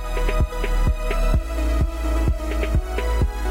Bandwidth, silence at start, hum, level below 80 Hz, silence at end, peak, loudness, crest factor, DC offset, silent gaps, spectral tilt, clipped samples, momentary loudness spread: 16 kHz; 0 s; none; -22 dBFS; 0 s; -10 dBFS; -24 LUFS; 12 dB; under 0.1%; none; -6 dB/octave; under 0.1%; 2 LU